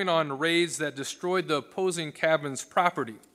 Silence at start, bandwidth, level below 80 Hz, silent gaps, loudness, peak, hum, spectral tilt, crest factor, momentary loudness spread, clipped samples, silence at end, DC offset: 0 s; 15.5 kHz; -78 dBFS; none; -28 LUFS; -8 dBFS; none; -3.5 dB/octave; 20 dB; 6 LU; under 0.1%; 0.15 s; under 0.1%